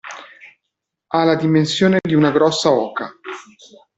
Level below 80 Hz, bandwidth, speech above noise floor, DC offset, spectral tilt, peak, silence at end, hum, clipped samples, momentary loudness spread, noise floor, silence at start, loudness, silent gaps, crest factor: -58 dBFS; 8.2 kHz; 63 dB; under 0.1%; -5.5 dB/octave; -2 dBFS; 0.55 s; none; under 0.1%; 19 LU; -79 dBFS; 0.05 s; -16 LUFS; none; 16 dB